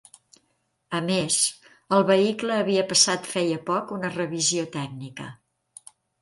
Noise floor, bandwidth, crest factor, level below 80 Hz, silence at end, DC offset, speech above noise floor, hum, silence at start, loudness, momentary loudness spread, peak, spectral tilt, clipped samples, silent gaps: -72 dBFS; 11.5 kHz; 22 dB; -68 dBFS; 0.85 s; under 0.1%; 48 dB; none; 0.9 s; -23 LUFS; 15 LU; -4 dBFS; -3 dB/octave; under 0.1%; none